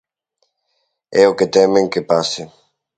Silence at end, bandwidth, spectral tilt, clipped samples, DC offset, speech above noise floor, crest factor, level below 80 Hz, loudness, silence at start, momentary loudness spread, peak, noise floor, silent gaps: 0.5 s; 9.2 kHz; -4.5 dB/octave; under 0.1%; under 0.1%; 55 dB; 18 dB; -58 dBFS; -15 LUFS; 1.1 s; 12 LU; 0 dBFS; -69 dBFS; none